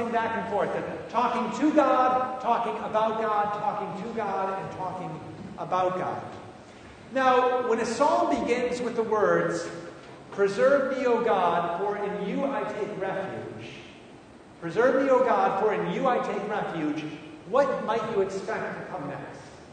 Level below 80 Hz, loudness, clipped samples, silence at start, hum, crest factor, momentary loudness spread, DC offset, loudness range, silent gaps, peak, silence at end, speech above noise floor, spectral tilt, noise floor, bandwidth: -64 dBFS; -26 LUFS; under 0.1%; 0 s; none; 20 dB; 17 LU; under 0.1%; 5 LU; none; -8 dBFS; 0 s; 23 dB; -5.5 dB/octave; -49 dBFS; 9.6 kHz